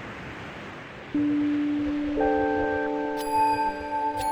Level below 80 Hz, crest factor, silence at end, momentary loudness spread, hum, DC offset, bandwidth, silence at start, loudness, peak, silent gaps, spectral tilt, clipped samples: -48 dBFS; 14 dB; 0 s; 14 LU; none; under 0.1%; 17.5 kHz; 0 s; -26 LUFS; -12 dBFS; none; -5.5 dB/octave; under 0.1%